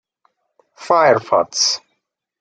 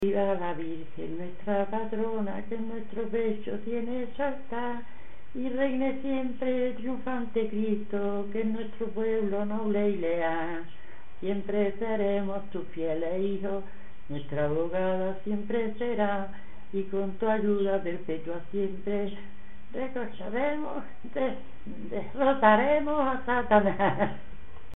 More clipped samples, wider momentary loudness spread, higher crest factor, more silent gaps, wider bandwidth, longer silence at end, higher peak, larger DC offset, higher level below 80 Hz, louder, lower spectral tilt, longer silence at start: neither; second, 5 LU vs 11 LU; about the same, 18 dB vs 22 dB; neither; first, 11 kHz vs 4 kHz; first, 0.65 s vs 0 s; first, -2 dBFS vs -6 dBFS; second, under 0.1% vs 3%; second, -70 dBFS vs -54 dBFS; first, -16 LUFS vs -30 LUFS; second, -2 dB/octave vs -9.5 dB/octave; first, 0.8 s vs 0 s